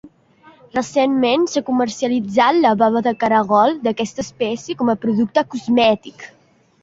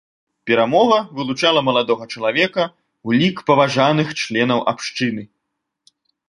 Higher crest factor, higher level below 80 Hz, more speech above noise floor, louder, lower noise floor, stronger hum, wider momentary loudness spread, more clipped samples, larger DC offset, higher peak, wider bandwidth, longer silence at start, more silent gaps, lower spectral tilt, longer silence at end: about the same, 16 dB vs 18 dB; about the same, -58 dBFS vs -60 dBFS; second, 33 dB vs 60 dB; about the same, -17 LUFS vs -17 LUFS; second, -50 dBFS vs -77 dBFS; neither; about the same, 9 LU vs 9 LU; neither; neither; about the same, -2 dBFS vs -2 dBFS; second, 7.8 kHz vs 11.5 kHz; second, 0.05 s vs 0.45 s; neither; about the same, -5 dB/octave vs -5 dB/octave; second, 0.55 s vs 1.05 s